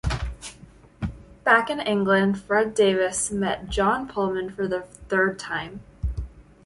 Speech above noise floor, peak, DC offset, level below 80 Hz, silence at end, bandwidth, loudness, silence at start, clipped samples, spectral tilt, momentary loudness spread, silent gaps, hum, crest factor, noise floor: 26 dB; -6 dBFS; under 0.1%; -38 dBFS; 0.25 s; 11.5 kHz; -24 LUFS; 0.05 s; under 0.1%; -4.5 dB/octave; 15 LU; none; none; 20 dB; -49 dBFS